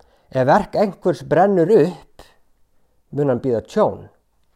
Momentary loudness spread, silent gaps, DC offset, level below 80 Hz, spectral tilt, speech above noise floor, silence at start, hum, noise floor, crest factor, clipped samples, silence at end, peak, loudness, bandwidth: 12 LU; none; under 0.1%; -52 dBFS; -8 dB/octave; 42 dB; 0.35 s; none; -59 dBFS; 16 dB; under 0.1%; 0.5 s; -4 dBFS; -18 LUFS; 13 kHz